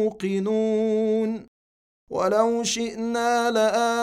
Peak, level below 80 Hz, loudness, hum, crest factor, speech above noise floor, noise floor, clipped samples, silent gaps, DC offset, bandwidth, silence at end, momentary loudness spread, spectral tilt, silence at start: -8 dBFS; -62 dBFS; -23 LUFS; none; 16 dB; over 67 dB; under -90 dBFS; under 0.1%; 1.48-2.07 s; under 0.1%; 15 kHz; 0 s; 6 LU; -4 dB/octave; 0 s